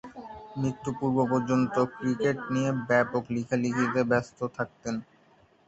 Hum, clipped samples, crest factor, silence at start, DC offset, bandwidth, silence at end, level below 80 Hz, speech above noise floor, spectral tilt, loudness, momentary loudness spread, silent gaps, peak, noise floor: none; under 0.1%; 20 dB; 0.05 s; under 0.1%; 8 kHz; 0.65 s; -62 dBFS; 34 dB; -7 dB/octave; -28 LUFS; 10 LU; none; -10 dBFS; -61 dBFS